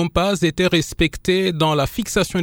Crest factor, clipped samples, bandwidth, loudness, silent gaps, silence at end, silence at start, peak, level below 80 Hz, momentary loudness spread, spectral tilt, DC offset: 14 dB; under 0.1%; 19 kHz; -19 LUFS; none; 0 s; 0 s; -4 dBFS; -36 dBFS; 3 LU; -5 dB/octave; under 0.1%